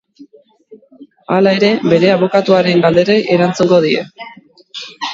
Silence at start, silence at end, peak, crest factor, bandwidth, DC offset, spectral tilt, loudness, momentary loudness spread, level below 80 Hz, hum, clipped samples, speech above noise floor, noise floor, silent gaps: 0.2 s; 0 s; 0 dBFS; 14 dB; 7.8 kHz; under 0.1%; -6 dB/octave; -12 LUFS; 18 LU; -54 dBFS; none; under 0.1%; 33 dB; -45 dBFS; none